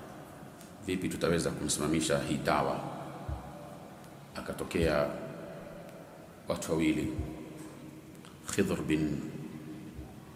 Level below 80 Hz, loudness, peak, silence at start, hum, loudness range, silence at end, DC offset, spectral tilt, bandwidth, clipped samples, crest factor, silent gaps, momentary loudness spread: -52 dBFS; -33 LUFS; -12 dBFS; 0 s; none; 4 LU; 0 s; under 0.1%; -5 dB/octave; 16 kHz; under 0.1%; 22 dB; none; 19 LU